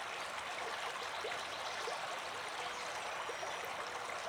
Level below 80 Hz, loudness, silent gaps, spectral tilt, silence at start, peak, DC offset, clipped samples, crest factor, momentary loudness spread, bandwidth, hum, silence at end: -76 dBFS; -41 LUFS; none; -1 dB/octave; 0 s; -28 dBFS; under 0.1%; under 0.1%; 14 dB; 1 LU; over 20 kHz; none; 0 s